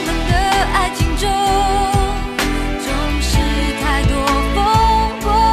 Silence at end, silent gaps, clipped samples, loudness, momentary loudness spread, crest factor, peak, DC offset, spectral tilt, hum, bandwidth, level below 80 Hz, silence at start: 0 s; none; under 0.1%; -16 LUFS; 5 LU; 12 dB; -2 dBFS; under 0.1%; -4.5 dB/octave; none; 14 kHz; -20 dBFS; 0 s